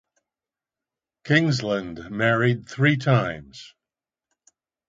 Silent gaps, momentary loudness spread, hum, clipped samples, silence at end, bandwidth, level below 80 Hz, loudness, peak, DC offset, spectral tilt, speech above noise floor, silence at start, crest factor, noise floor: none; 15 LU; none; under 0.1%; 1.2 s; 7.8 kHz; -58 dBFS; -22 LUFS; -6 dBFS; under 0.1%; -6.5 dB/octave; over 68 dB; 1.25 s; 20 dB; under -90 dBFS